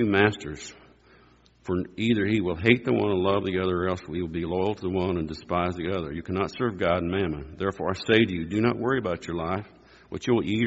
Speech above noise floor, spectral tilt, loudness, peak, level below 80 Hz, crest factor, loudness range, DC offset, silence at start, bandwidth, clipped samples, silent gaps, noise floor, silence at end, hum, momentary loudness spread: 32 dB; -5 dB/octave; -26 LUFS; -2 dBFS; -50 dBFS; 24 dB; 3 LU; under 0.1%; 0 s; 8 kHz; under 0.1%; none; -57 dBFS; 0 s; none; 9 LU